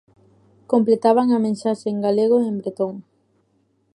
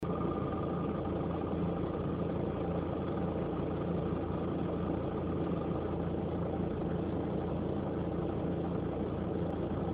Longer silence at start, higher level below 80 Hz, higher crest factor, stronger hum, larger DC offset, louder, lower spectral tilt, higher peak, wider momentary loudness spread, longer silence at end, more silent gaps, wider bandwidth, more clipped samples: first, 0.7 s vs 0 s; second, -72 dBFS vs -50 dBFS; about the same, 18 dB vs 14 dB; neither; neither; first, -20 LUFS vs -35 LUFS; about the same, -7.5 dB/octave vs -8.5 dB/octave; first, -4 dBFS vs -22 dBFS; first, 10 LU vs 1 LU; first, 0.95 s vs 0 s; neither; first, 11 kHz vs 4.6 kHz; neither